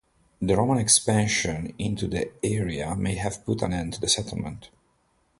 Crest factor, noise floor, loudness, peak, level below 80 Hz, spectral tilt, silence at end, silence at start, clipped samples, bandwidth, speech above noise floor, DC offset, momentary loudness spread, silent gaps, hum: 22 dB; -67 dBFS; -25 LUFS; -4 dBFS; -46 dBFS; -4 dB/octave; 0.75 s; 0.4 s; under 0.1%; 11.5 kHz; 42 dB; under 0.1%; 13 LU; none; none